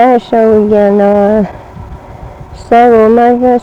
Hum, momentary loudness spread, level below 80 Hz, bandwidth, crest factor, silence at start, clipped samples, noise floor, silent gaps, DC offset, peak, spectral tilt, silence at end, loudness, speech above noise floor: none; 23 LU; -34 dBFS; 8.4 kHz; 8 dB; 0 s; 0.6%; -28 dBFS; none; under 0.1%; 0 dBFS; -8 dB/octave; 0 s; -7 LUFS; 21 dB